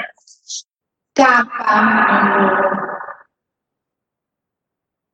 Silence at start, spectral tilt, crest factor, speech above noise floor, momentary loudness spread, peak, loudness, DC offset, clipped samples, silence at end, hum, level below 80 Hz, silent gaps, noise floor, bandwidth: 0 s; -4.5 dB/octave; 16 dB; 69 dB; 17 LU; -2 dBFS; -14 LUFS; under 0.1%; under 0.1%; 2 s; none; -60 dBFS; none; -83 dBFS; 8.6 kHz